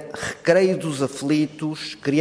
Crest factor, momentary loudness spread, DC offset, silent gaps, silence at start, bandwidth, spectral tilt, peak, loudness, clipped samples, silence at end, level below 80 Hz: 18 dB; 10 LU; under 0.1%; none; 0 s; 11 kHz; -5.5 dB/octave; -4 dBFS; -22 LUFS; under 0.1%; 0 s; -60 dBFS